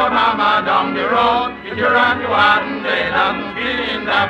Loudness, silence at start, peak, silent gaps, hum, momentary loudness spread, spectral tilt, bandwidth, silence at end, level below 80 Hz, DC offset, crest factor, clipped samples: -15 LUFS; 0 s; -2 dBFS; none; none; 6 LU; -5 dB/octave; 10.5 kHz; 0 s; -46 dBFS; under 0.1%; 14 dB; under 0.1%